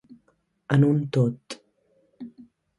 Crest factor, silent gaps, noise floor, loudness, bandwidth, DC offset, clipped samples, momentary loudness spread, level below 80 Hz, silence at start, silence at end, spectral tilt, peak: 22 dB; none; -68 dBFS; -23 LUFS; 11 kHz; under 0.1%; under 0.1%; 23 LU; -64 dBFS; 0.7 s; 0.5 s; -8 dB/octave; -4 dBFS